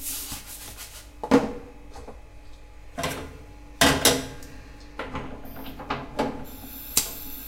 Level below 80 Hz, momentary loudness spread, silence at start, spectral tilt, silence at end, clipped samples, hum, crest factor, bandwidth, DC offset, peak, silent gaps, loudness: -44 dBFS; 23 LU; 0 s; -2.5 dB/octave; 0 s; under 0.1%; none; 28 dB; 16 kHz; under 0.1%; -2 dBFS; none; -25 LUFS